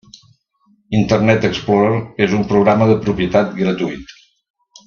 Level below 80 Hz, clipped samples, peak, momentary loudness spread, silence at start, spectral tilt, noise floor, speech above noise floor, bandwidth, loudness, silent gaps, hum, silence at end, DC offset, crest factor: -46 dBFS; under 0.1%; 0 dBFS; 7 LU; 0.9 s; -7 dB/octave; -58 dBFS; 43 dB; 7 kHz; -15 LUFS; none; none; 0.8 s; under 0.1%; 16 dB